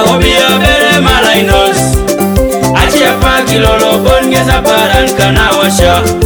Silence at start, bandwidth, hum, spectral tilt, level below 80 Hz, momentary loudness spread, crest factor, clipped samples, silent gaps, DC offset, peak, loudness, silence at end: 0 s; over 20 kHz; none; -4 dB/octave; -18 dBFS; 4 LU; 8 dB; 0.8%; none; under 0.1%; 0 dBFS; -7 LUFS; 0 s